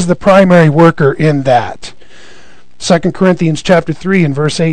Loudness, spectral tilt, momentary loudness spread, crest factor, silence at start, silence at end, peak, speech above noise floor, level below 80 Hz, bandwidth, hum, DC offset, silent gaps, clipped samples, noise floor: -10 LUFS; -6.5 dB/octave; 10 LU; 10 dB; 0 s; 0 s; 0 dBFS; 33 dB; -40 dBFS; 9.8 kHz; none; 4%; none; 3%; -42 dBFS